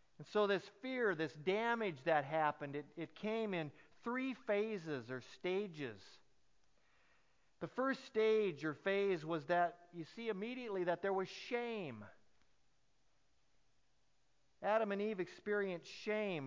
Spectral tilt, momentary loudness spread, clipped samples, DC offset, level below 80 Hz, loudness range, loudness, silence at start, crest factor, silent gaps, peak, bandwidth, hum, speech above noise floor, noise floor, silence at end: -6 dB/octave; 11 LU; under 0.1%; under 0.1%; -84 dBFS; 7 LU; -40 LUFS; 0.2 s; 20 dB; none; -22 dBFS; 7.6 kHz; none; 42 dB; -81 dBFS; 0 s